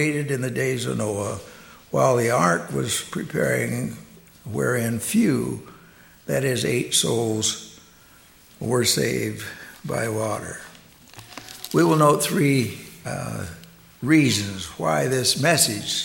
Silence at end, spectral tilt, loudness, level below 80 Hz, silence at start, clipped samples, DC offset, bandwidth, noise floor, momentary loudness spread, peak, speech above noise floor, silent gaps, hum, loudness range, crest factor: 0 s; -4 dB/octave; -22 LUFS; -56 dBFS; 0 s; under 0.1%; under 0.1%; 17 kHz; -51 dBFS; 18 LU; -4 dBFS; 29 dB; none; none; 4 LU; 20 dB